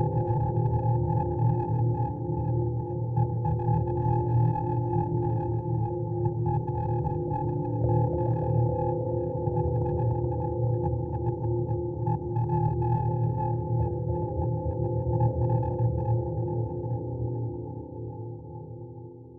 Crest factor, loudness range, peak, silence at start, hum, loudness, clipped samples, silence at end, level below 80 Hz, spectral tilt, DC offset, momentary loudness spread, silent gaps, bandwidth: 14 dB; 1 LU; -14 dBFS; 0 s; none; -28 LUFS; under 0.1%; 0 s; -42 dBFS; -14 dB/octave; under 0.1%; 6 LU; none; 2.6 kHz